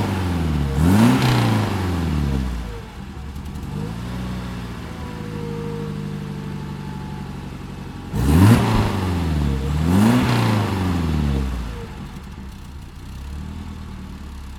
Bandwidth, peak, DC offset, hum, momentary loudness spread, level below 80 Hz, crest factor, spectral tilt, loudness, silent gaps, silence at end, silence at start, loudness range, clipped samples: 17.5 kHz; -2 dBFS; under 0.1%; none; 19 LU; -30 dBFS; 20 dB; -6.5 dB/octave; -21 LUFS; none; 0 s; 0 s; 12 LU; under 0.1%